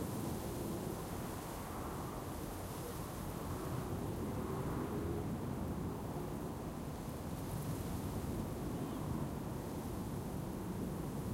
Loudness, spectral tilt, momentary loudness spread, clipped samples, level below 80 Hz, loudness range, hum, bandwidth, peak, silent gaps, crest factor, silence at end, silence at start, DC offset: -43 LUFS; -6.5 dB/octave; 4 LU; under 0.1%; -52 dBFS; 2 LU; none; 16 kHz; -26 dBFS; none; 14 dB; 0 s; 0 s; under 0.1%